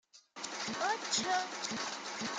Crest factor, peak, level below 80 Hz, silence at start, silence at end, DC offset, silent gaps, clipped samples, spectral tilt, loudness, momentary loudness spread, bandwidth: 20 dB; -18 dBFS; -80 dBFS; 0.15 s; 0 s; under 0.1%; none; under 0.1%; -1 dB/octave; -36 LUFS; 11 LU; 10.5 kHz